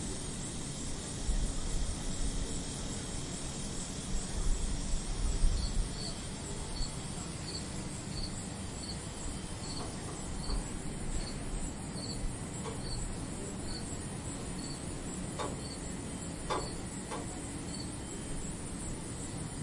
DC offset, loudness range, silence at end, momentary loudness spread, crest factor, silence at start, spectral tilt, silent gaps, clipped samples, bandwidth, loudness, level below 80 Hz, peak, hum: under 0.1%; 2 LU; 0 s; 4 LU; 20 dB; 0 s; -4 dB/octave; none; under 0.1%; 11.5 kHz; -39 LUFS; -40 dBFS; -16 dBFS; none